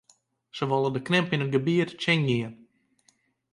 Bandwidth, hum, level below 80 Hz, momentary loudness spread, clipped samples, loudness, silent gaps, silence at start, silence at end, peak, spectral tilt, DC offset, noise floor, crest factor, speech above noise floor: 11 kHz; none; -68 dBFS; 8 LU; under 0.1%; -26 LUFS; none; 0.55 s; 1 s; -10 dBFS; -6.5 dB/octave; under 0.1%; -67 dBFS; 18 dB; 42 dB